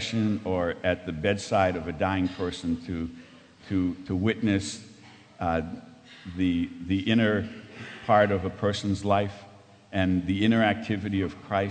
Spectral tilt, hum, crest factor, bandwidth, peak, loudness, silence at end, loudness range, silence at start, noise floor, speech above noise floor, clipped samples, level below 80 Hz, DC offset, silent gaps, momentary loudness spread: -6 dB/octave; none; 20 dB; 9.4 kHz; -8 dBFS; -27 LUFS; 0 s; 4 LU; 0 s; -51 dBFS; 24 dB; under 0.1%; -52 dBFS; under 0.1%; none; 13 LU